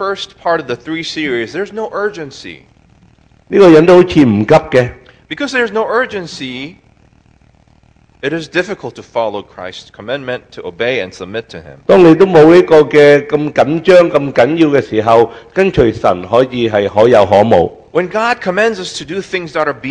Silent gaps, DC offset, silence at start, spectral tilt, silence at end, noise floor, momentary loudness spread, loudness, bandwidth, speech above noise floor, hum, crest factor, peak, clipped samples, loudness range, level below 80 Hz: none; under 0.1%; 0 s; -6.5 dB/octave; 0 s; -48 dBFS; 18 LU; -11 LUFS; 11 kHz; 37 dB; none; 12 dB; 0 dBFS; 2%; 13 LU; -42 dBFS